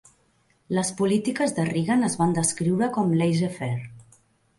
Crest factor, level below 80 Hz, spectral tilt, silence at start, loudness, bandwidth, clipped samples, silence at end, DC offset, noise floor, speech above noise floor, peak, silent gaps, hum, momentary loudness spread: 16 dB; -62 dBFS; -5.5 dB/octave; 0.7 s; -24 LUFS; 11.5 kHz; under 0.1%; 0.55 s; under 0.1%; -65 dBFS; 42 dB; -10 dBFS; none; none; 8 LU